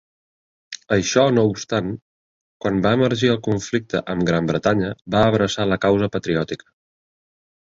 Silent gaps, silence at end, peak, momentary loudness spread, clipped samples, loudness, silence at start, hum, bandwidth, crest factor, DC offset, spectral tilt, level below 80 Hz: 2.02-2.60 s; 1.1 s; -2 dBFS; 11 LU; under 0.1%; -20 LUFS; 0.7 s; none; 7.8 kHz; 18 dB; under 0.1%; -5.5 dB/octave; -48 dBFS